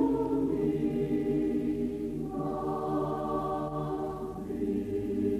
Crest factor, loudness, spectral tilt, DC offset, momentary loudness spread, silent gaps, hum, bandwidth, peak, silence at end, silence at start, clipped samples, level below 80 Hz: 14 dB; -32 LUFS; -9 dB/octave; under 0.1%; 6 LU; none; none; 14 kHz; -16 dBFS; 0 s; 0 s; under 0.1%; -50 dBFS